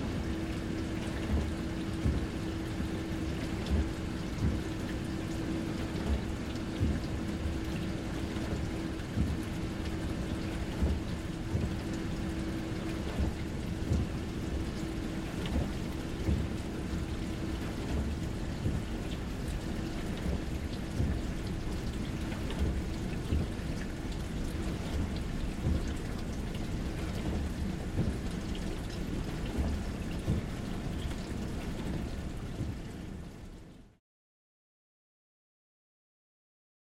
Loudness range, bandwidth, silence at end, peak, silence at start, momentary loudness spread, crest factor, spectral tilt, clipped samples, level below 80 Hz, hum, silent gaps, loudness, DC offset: 3 LU; 15.5 kHz; 3.1 s; -18 dBFS; 0 s; 5 LU; 16 dB; -6.5 dB/octave; under 0.1%; -40 dBFS; none; none; -36 LUFS; under 0.1%